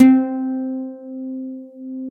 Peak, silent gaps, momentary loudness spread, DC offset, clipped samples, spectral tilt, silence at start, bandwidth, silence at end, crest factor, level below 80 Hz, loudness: 0 dBFS; none; 16 LU; under 0.1%; under 0.1%; -7 dB/octave; 0 s; 3.8 kHz; 0 s; 18 dB; -74 dBFS; -22 LUFS